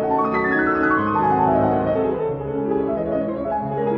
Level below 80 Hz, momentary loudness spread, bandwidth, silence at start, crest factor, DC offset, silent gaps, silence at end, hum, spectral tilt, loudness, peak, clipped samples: -46 dBFS; 6 LU; 5.6 kHz; 0 s; 14 dB; under 0.1%; none; 0 s; none; -10 dB/octave; -20 LUFS; -6 dBFS; under 0.1%